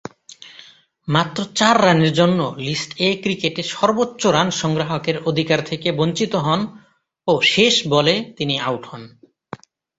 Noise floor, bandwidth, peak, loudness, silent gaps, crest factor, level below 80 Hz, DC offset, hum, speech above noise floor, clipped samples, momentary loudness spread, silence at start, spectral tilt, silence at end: -47 dBFS; 8 kHz; 0 dBFS; -18 LUFS; none; 20 dB; -56 dBFS; under 0.1%; none; 28 dB; under 0.1%; 21 LU; 0.3 s; -4.5 dB/octave; 0.9 s